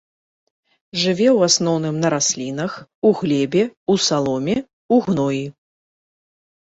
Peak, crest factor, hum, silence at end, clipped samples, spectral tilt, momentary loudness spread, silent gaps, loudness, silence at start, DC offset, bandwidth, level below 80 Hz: -2 dBFS; 18 dB; none; 1.25 s; under 0.1%; -4 dB/octave; 10 LU; 2.95-3.02 s, 3.77-3.86 s, 4.73-4.89 s; -19 LUFS; 0.95 s; under 0.1%; 8.4 kHz; -58 dBFS